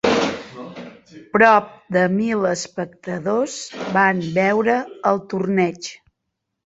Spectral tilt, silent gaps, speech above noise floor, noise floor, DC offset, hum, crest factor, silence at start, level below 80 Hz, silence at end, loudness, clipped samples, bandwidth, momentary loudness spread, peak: -5 dB/octave; none; 59 dB; -78 dBFS; under 0.1%; none; 18 dB; 0.05 s; -58 dBFS; 0.7 s; -19 LUFS; under 0.1%; 8 kHz; 18 LU; -2 dBFS